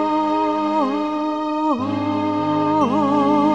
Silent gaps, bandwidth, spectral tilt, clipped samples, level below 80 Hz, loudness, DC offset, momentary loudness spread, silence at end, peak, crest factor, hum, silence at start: none; 7.8 kHz; -7 dB/octave; under 0.1%; -64 dBFS; -19 LUFS; 0.3%; 5 LU; 0 s; -6 dBFS; 14 dB; none; 0 s